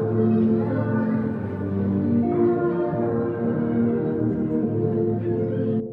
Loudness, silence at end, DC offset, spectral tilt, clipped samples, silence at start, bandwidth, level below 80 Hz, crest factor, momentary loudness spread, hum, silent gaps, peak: -23 LUFS; 0 s; under 0.1%; -12 dB/octave; under 0.1%; 0 s; 4 kHz; -54 dBFS; 12 dB; 4 LU; none; none; -10 dBFS